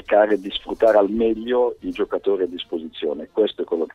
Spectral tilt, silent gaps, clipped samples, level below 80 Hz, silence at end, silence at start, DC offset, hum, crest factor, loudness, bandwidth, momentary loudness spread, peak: -6 dB/octave; none; under 0.1%; -52 dBFS; 0.05 s; 0.1 s; under 0.1%; none; 18 dB; -21 LUFS; 7.6 kHz; 10 LU; -2 dBFS